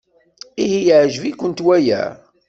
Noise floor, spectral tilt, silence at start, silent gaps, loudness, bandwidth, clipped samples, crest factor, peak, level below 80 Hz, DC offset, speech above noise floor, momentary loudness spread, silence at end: -43 dBFS; -5.5 dB/octave; 0.55 s; none; -16 LUFS; 7.8 kHz; under 0.1%; 14 dB; -2 dBFS; -58 dBFS; under 0.1%; 28 dB; 10 LU; 0.35 s